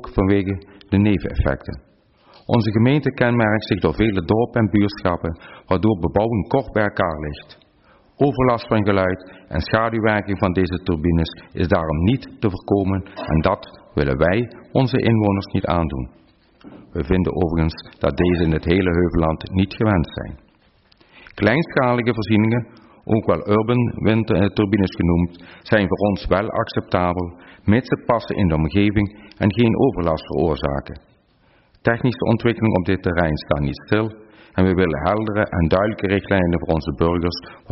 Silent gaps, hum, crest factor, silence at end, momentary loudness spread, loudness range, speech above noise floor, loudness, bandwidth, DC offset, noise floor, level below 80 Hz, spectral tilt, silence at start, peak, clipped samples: none; none; 16 dB; 0.15 s; 9 LU; 2 LU; 38 dB; -20 LUFS; 5.8 kHz; under 0.1%; -57 dBFS; -36 dBFS; -6.5 dB/octave; 0 s; -4 dBFS; under 0.1%